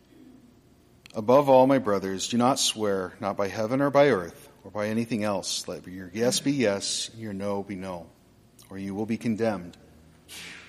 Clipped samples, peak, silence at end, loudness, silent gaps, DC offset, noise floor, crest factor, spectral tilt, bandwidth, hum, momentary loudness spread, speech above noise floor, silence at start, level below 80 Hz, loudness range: under 0.1%; -8 dBFS; 0 s; -25 LUFS; none; under 0.1%; -57 dBFS; 20 dB; -4 dB/octave; 15.5 kHz; none; 18 LU; 32 dB; 1.15 s; -64 dBFS; 8 LU